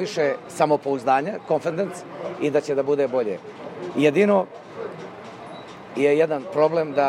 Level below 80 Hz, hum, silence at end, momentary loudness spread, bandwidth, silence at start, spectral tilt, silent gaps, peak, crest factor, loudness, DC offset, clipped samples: -72 dBFS; none; 0 s; 18 LU; 12 kHz; 0 s; -6 dB/octave; none; -4 dBFS; 18 dB; -22 LUFS; under 0.1%; under 0.1%